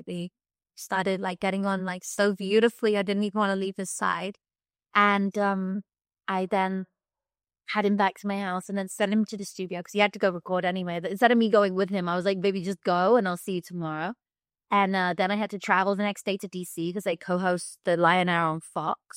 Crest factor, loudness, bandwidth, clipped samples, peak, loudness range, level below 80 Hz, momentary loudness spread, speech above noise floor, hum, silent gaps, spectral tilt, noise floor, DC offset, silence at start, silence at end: 20 dB; -26 LUFS; 16 kHz; under 0.1%; -6 dBFS; 4 LU; -74 dBFS; 11 LU; over 64 dB; none; none; -5 dB/octave; under -90 dBFS; under 0.1%; 0.05 s; 0 s